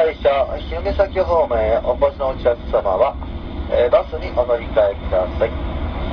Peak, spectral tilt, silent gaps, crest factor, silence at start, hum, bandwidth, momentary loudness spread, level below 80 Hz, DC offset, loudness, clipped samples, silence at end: -4 dBFS; -8.5 dB/octave; none; 16 dB; 0 s; none; 5.4 kHz; 8 LU; -28 dBFS; under 0.1%; -19 LUFS; under 0.1%; 0 s